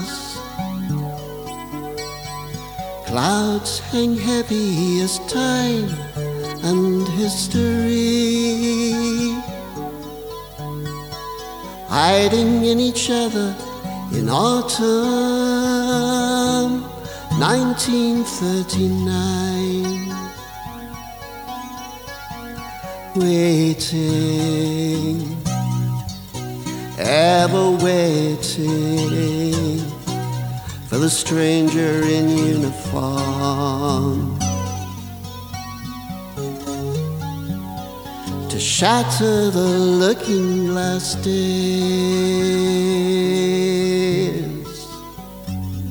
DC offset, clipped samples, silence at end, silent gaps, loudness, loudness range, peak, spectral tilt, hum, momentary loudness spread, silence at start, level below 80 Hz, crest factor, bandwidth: under 0.1%; under 0.1%; 0 s; none; -19 LUFS; 7 LU; -2 dBFS; -5 dB/octave; none; 15 LU; 0 s; -46 dBFS; 18 dB; over 20 kHz